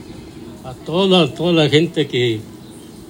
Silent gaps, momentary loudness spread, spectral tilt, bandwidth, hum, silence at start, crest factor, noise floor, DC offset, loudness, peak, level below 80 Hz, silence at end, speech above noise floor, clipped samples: none; 22 LU; -6 dB/octave; 16.5 kHz; none; 0 s; 18 dB; -37 dBFS; under 0.1%; -16 LUFS; 0 dBFS; -50 dBFS; 0.05 s; 21 dB; under 0.1%